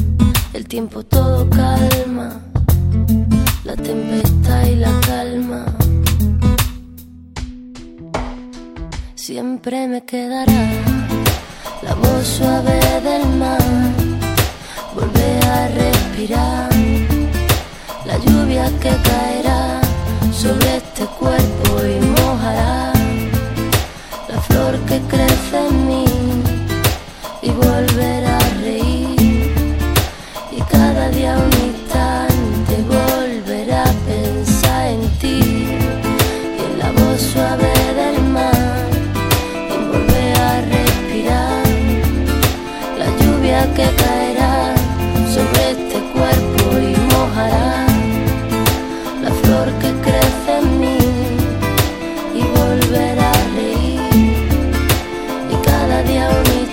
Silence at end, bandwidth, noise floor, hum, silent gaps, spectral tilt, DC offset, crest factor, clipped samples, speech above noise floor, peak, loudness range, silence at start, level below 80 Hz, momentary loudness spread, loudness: 0 s; 16.5 kHz; -36 dBFS; none; none; -5.5 dB/octave; under 0.1%; 14 dB; under 0.1%; 22 dB; 0 dBFS; 2 LU; 0 s; -22 dBFS; 9 LU; -15 LUFS